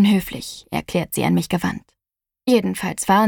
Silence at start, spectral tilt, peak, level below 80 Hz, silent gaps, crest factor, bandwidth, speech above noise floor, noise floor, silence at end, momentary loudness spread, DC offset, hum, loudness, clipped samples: 0 s; -5.5 dB/octave; -4 dBFS; -50 dBFS; none; 16 dB; 19 kHz; 68 dB; -87 dBFS; 0 s; 11 LU; under 0.1%; none; -21 LUFS; under 0.1%